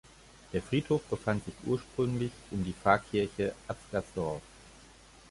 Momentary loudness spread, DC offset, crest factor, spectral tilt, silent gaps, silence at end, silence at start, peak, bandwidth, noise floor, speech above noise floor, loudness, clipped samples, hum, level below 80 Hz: 10 LU; under 0.1%; 24 dB; -6.5 dB/octave; none; 0.55 s; 0.5 s; -10 dBFS; 11.5 kHz; -56 dBFS; 24 dB; -33 LUFS; under 0.1%; none; -54 dBFS